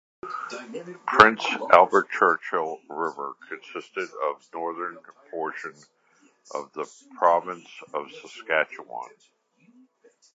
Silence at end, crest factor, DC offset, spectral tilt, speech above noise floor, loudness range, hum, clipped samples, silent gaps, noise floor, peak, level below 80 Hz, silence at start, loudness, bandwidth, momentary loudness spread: 1.3 s; 26 dB; under 0.1%; -4 dB/octave; 37 dB; 12 LU; none; under 0.1%; none; -62 dBFS; 0 dBFS; -66 dBFS; 0.25 s; -24 LUFS; 8.6 kHz; 21 LU